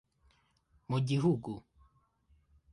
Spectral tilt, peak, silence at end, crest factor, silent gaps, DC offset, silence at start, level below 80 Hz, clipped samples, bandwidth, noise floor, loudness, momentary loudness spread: -7.5 dB/octave; -18 dBFS; 1.15 s; 18 dB; none; under 0.1%; 0.9 s; -66 dBFS; under 0.1%; 11.5 kHz; -71 dBFS; -33 LUFS; 15 LU